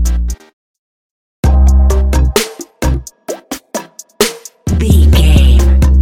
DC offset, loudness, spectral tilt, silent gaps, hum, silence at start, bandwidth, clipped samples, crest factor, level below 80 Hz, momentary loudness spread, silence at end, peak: under 0.1%; -12 LUFS; -5.5 dB/octave; 0.53-1.43 s; none; 0 s; 16.5 kHz; 0.1%; 10 dB; -12 dBFS; 16 LU; 0 s; 0 dBFS